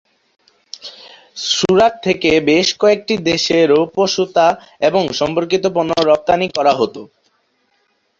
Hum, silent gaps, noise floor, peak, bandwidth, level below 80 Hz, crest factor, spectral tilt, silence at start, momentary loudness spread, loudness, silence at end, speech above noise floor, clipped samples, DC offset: none; none; -63 dBFS; 0 dBFS; 7.8 kHz; -52 dBFS; 16 dB; -4 dB/octave; 0.85 s; 16 LU; -15 LUFS; 1.15 s; 48 dB; under 0.1%; under 0.1%